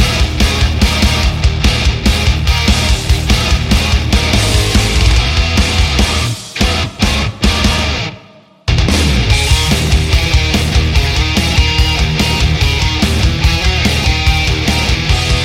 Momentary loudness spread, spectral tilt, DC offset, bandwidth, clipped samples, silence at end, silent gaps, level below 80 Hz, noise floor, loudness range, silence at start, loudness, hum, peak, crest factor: 3 LU; -4 dB/octave; under 0.1%; 16 kHz; under 0.1%; 0 s; none; -16 dBFS; -40 dBFS; 2 LU; 0 s; -12 LUFS; none; 0 dBFS; 12 dB